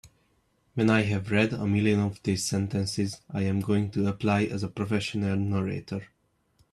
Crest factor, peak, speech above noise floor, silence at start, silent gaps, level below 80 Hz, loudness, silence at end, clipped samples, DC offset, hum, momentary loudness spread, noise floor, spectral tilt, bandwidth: 18 dB; -10 dBFS; 42 dB; 0.05 s; none; -60 dBFS; -27 LUFS; 0.7 s; under 0.1%; under 0.1%; none; 8 LU; -69 dBFS; -6 dB/octave; 13 kHz